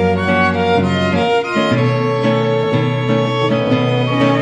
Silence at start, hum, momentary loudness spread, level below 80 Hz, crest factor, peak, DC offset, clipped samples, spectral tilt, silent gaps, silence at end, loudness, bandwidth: 0 s; none; 2 LU; -48 dBFS; 12 dB; -2 dBFS; under 0.1%; under 0.1%; -7 dB/octave; none; 0 s; -15 LUFS; 9.8 kHz